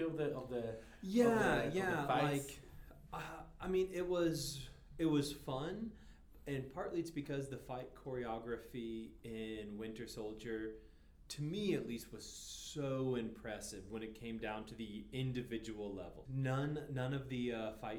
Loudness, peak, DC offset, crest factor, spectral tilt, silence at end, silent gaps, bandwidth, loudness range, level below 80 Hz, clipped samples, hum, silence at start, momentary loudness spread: -41 LUFS; -20 dBFS; under 0.1%; 22 dB; -5.5 dB/octave; 0 s; none; over 20 kHz; 8 LU; -60 dBFS; under 0.1%; none; 0 s; 13 LU